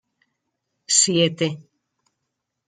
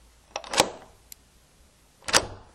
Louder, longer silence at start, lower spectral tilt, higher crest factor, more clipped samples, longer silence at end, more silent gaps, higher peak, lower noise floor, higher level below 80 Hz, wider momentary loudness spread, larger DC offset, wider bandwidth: first, -18 LUFS vs -24 LUFS; first, 0.9 s vs 0.35 s; first, -2.5 dB/octave vs -1 dB/octave; second, 22 dB vs 28 dB; neither; first, 1.05 s vs 0.15 s; neither; about the same, -2 dBFS vs -2 dBFS; first, -79 dBFS vs -58 dBFS; second, -70 dBFS vs -52 dBFS; second, 12 LU vs 22 LU; neither; second, 10 kHz vs 16 kHz